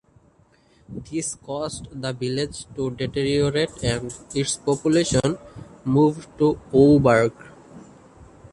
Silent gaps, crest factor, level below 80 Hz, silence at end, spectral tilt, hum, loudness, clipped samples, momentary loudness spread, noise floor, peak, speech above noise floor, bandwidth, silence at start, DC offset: none; 20 dB; -46 dBFS; 0.3 s; -5.5 dB/octave; none; -22 LUFS; under 0.1%; 14 LU; -58 dBFS; -4 dBFS; 36 dB; 11.5 kHz; 0.9 s; under 0.1%